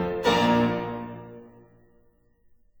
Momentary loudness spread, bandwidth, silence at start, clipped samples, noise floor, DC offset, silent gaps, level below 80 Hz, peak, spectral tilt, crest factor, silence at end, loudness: 21 LU; over 20 kHz; 0 s; under 0.1%; -61 dBFS; under 0.1%; none; -52 dBFS; -8 dBFS; -5.5 dB/octave; 20 dB; 1.3 s; -24 LUFS